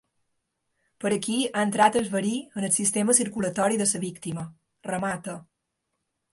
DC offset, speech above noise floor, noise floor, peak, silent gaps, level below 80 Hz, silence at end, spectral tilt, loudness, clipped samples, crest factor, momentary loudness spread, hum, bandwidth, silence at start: under 0.1%; 55 dB; -80 dBFS; -6 dBFS; none; -66 dBFS; 0.9 s; -3.5 dB/octave; -25 LUFS; under 0.1%; 22 dB; 14 LU; none; 12 kHz; 1 s